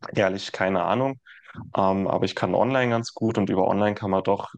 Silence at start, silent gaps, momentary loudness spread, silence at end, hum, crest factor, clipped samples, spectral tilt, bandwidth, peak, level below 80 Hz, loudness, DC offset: 0 s; none; 7 LU; 0.1 s; none; 18 dB; under 0.1%; -6.5 dB/octave; 9 kHz; -6 dBFS; -64 dBFS; -24 LUFS; under 0.1%